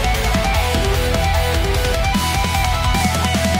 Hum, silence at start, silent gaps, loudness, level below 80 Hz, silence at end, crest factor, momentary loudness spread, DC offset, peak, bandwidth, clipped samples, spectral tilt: none; 0 s; none; -17 LUFS; -22 dBFS; 0 s; 12 dB; 1 LU; under 0.1%; -4 dBFS; 16 kHz; under 0.1%; -4.5 dB/octave